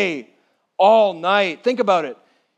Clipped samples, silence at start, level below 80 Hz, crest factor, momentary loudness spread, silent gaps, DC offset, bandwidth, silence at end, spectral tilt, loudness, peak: under 0.1%; 0 s; -82 dBFS; 16 dB; 18 LU; none; under 0.1%; 8.4 kHz; 0.45 s; -5 dB/octave; -17 LUFS; -2 dBFS